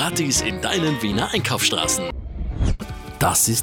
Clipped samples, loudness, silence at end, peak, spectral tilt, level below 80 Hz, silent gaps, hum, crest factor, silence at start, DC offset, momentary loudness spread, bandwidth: under 0.1%; -21 LUFS; 0 s; -8 dBFS; -3 dB/octave; -32 dBFS; none; none; 14 dB; 0 s; under 0.1%; 13 LU; 18 kHz